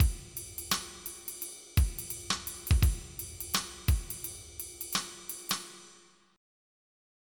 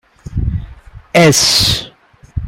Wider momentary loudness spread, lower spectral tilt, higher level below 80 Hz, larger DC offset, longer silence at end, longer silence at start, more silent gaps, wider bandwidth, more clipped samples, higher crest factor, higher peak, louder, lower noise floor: second, 11 LU vs 17 LU; about the same, -3 dB/octave vs -3.5 dB/octave; second, -36 dBFS vs -28 dBFS; neither; first, 1.4 s vs 0 s; second, 0 s vs 0.3 s; neither; first, 19 kHz vs 16.5 kHz; neither; first, 20 dB vs 14 dB; second, -12 dBFS vs 0 dBFS; second, -34 LUFS vs -11 LUFS; first, -60 dBFS vs -35 dBFS